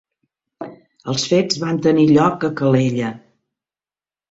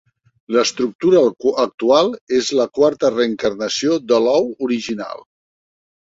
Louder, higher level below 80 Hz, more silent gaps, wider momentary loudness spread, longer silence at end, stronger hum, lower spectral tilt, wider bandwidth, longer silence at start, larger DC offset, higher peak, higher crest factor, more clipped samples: about the same, -17 LUFS vs -17 LUFS; about the same, -56 dBFS vs -58 dBFS; second, none vs 0.95-0.99 s, 1.74-1.78 s, 2.21-2.27 s; first, 22 LU vs 7 LU; first, 1.1 s vs 0.85 s; neither; first, -6 dB/octave vs -4 dB/octave; about the same, 8 kHz vs 7.8 kHz; about the same, 0.6 s vs 0.5 s; neither; about the same, -2 dBFS vs -2 dBFS; about the same, 16 dB vs 16 dB; neither